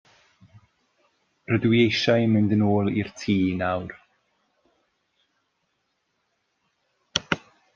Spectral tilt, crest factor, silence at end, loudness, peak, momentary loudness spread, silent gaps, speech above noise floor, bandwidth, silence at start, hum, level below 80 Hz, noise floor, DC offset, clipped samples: -6 dB/octave; 24 dB; 0.35 s; -23 LUFS; -2 dBFS; 10 LU; none; 53 dB; 7.4 kHz; 1.5 s; none; -62 dBFS; -74 dBFS; under 0.1%; under 0.1%